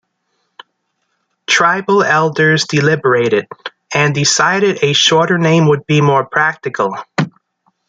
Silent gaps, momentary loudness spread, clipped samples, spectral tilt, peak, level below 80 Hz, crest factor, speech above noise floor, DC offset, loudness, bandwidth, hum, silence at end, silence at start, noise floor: none; 9 LU; under 0.1%; -4 dB/octave; 0 dBFS; -56 dBFS; 14 dB; 55 dB; under 0.1%; -12 LUFS; 9.4 kHz; none; 0.6 s; 1.5 s; -68 dBFS